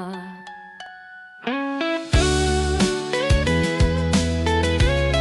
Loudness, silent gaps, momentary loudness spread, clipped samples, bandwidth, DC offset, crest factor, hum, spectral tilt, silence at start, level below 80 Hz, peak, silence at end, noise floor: -21 LUFS; none; 19 LU; under 0.1%; 12 kHz; under 0.1%; 12 dB; none; -5 dB/octave; 0 s; -28 dBFS; -8 dBFS; 0 s; -42 dBFS